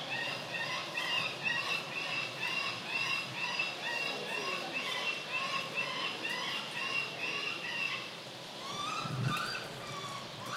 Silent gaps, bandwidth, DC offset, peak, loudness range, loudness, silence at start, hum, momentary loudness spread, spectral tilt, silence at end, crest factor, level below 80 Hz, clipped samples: none; 16 kHz; under 0.1%; -22 dBFS; 2 LU; -35 LUFS; 0 s; none; 8 LU; -2.5 dB/octave; 0 s; 16 dB; -74 dBFS; under 0.1%